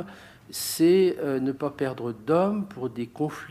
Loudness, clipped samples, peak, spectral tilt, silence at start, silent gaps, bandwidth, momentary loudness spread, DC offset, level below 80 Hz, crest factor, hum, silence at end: -26 LUFS; under 0.1%; -10 dBFS; -5.5 dB/octave; 0 s; none; 15.5 kHz; 13 LU; under 0.1%; -64 dBFS; 16 dB; none; 0 s